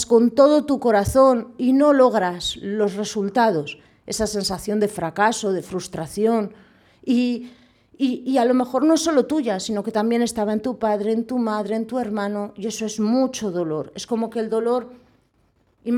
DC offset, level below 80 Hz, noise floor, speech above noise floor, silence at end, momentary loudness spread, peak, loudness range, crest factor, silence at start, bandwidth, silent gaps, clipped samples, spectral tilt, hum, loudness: under 0.1%; -52 dBFS; -63 dBFS; 43 dB; 0 s; 11 LU; -4 dBFS; 5 LU; 18 dB; 0 s; 15.5 kHz; none; under 0.1%; -5 dB/octave; none; -21 LUFS